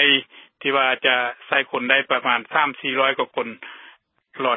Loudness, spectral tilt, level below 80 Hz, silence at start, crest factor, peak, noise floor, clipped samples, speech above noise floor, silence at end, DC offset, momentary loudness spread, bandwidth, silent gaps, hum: -20 LUFS; -7.5 dB/octave; -80 dBFS; 0 s; 20 dB; -2 dBFS; -52 dBFS; under 0.1%; 30 dB; 0 s; under 0.1%; 10 LU; 4 kHz; none; none